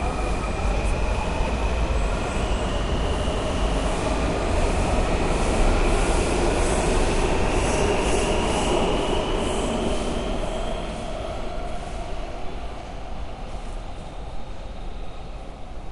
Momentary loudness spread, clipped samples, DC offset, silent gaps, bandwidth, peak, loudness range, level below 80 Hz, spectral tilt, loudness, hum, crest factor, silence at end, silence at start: 15 LU; under 0.1%; under 0.1%; none; 11.5 kHz; -8 dBFS; 13 LU; -26 dBFS; -5 dB/octave; -25 LUFS; none; 14 dB; 0 s; 0 s